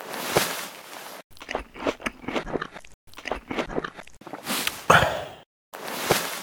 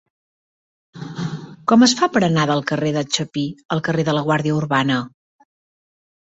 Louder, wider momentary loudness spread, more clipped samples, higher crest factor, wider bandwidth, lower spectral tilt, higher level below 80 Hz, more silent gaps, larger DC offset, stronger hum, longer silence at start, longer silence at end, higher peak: second, -26 LUFS vs -19 LUFS; first, 22 LU vs 14 LU; neither; first, 28 dB vs 18 dB; first, over 20 kHz vs 8.2 kHz; second, -3 dB/octave vs -5 dB/octave; first, -50 dBFS vs -58 dBFS; first, 1.24-1.30 s, 2.94-3.07 s, 5.46-5.72 s vs 3.65-3.69 s; neither; neither; second, 0 s vs 0.95 s; second, 0 s vs 1.3 s; about the same, 0 dBFS vs -2 dBFS